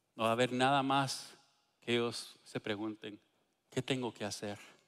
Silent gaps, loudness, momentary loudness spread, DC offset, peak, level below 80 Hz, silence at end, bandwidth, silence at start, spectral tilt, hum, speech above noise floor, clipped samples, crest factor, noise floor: none; -36 LUFS; 15 LU; under 0.1%; -18 dBFS; -78 dBFS; 0.15 s; 15.5 kHz; 0.15 s; -4.5 dB/octave; none; 34 dB; under 0.1%; 20 dB; -69 dBFS